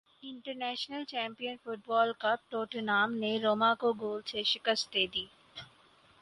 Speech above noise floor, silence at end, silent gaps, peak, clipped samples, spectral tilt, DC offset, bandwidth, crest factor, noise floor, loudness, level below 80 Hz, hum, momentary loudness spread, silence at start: 30 dB; 0.55 s; none; -14 dBFS; under 0.1%; -3.5 dB/octave; under 0.1%; 11.5 kHz; 18 dB; -63 dBFS; -32 LUFS; -74 dBFS; none; 15 LU; 0.25 s